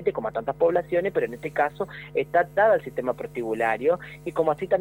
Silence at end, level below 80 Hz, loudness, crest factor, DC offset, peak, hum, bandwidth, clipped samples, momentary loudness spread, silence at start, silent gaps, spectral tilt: 0 s; -56 dBFS; -25 LUFS; 16 dB; under 0.1%; -8 dBFS; 50 Hz at -45 dBFS; 16.5 kHz; under 0.1%; 9 LU; 0 s; none; -7 dB/octave